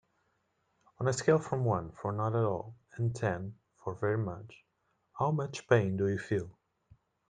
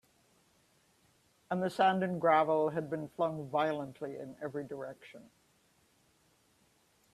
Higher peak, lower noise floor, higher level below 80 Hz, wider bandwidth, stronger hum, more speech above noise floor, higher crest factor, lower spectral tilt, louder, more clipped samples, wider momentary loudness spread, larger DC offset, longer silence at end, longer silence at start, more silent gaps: about the same, -12 dBFS vs -14 dBFS; first, -77 dBFS vs -70 dBFS; first, -66 dBFS vs -76 dBFS; second, 9.4 kHz vs 13.5 kHz; neither; first, 46 dB vs 37 dB; about the same, 22 dB vs 22 dB; about the same, -6.5 dB/octave vs -6.5 dB/octave; about the same, -32 LUFS vs -33 LUFS; neither; about the same, 15 LU vs 15 LU; neither; second, 0.8 s vs 1.85 s; second, 1 s vs 1.5 s; neither